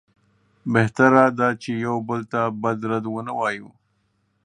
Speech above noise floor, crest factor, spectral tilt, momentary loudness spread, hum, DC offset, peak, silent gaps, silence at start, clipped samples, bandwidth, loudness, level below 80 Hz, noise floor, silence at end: 47 dB; 22 dB; -7 dB/octave; 11 LU; none; under 0.1%; 0 dBFS; none; 0.65 s; under 0.1%; 10.5 kHz; -21 LUFS; -62 dBFS; -68 dBFS; 0.8 s